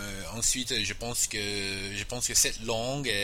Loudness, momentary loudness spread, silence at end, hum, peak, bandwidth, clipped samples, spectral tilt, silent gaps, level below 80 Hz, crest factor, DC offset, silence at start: -28 LUFS; 8 LU; 0 s; none; -10 dBFS; 16 kHz; under 0.1%; -1.5 dB/octave; none; -44 dBFS; 20 dB; 0.2%; 0 s